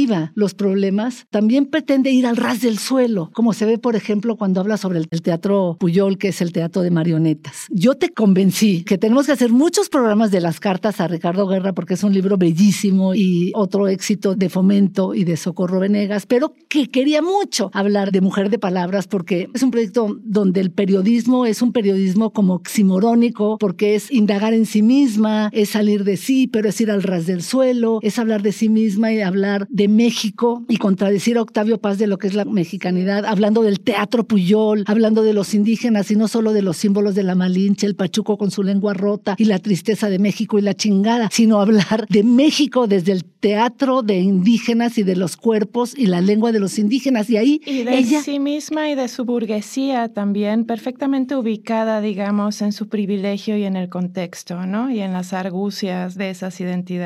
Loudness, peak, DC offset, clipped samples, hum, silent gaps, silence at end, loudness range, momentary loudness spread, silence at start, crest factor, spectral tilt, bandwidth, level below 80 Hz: -18 LUFS; -4 dBFS; under 0.1%; under 0.1%; none; none; 0 s; 5 LU; 6 LU; 0 s; 14 dB; -6 dB/octave; 14.5 kHz; -70 dBFS